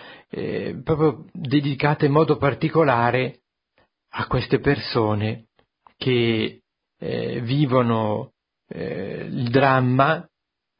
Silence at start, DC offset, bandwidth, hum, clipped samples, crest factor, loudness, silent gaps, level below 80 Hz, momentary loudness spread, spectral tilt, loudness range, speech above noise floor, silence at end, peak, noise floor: 0 s; under 0.1%; 5.4 kHz; none; under 0.1%; 20 dB; -22 LUFS; none; -50 dBFS; 13 LU; -11.5 dB/octave; 3 LU; 45 dB; 0.6 s; -2 dBFS; -66 dBFS